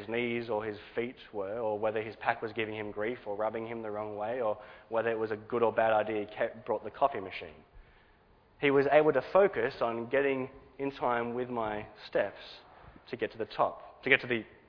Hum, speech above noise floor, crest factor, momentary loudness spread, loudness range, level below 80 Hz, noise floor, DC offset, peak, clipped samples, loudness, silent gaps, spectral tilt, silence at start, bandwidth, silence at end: none; 31 dB; 24 dB; 12 LU; 6 LU; -64 dBFS; -63 dBFS; under 0.1%; -8 dBFS; under 0.1%; -32 LUFS; none; -3.5 dB/octave; 0 s; 5.4 kHz; 0.2 s